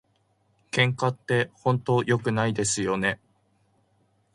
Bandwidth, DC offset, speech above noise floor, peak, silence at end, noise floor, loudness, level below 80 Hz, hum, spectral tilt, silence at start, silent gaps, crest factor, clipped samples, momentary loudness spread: 11.5 kHz; under 0.1%; 43 dB; -6 dBFS; 1.2 s; -68 dBFS; -25 LUFS; -60 dBFS; none; -4.5 dB/octave; 0.75 s; none; 20 dB; under 0.1%; 5 LU